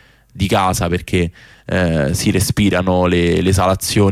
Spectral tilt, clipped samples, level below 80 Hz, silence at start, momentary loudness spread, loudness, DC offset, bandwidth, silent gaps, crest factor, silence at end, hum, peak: -5.5 dB/octave; under 0.1%; -34 dBFS; 0.35 s; 5 LU; -16 LUFS; under 0.1%; 16 kHz; none; 12 dB; 0 s; none; -4 dBFS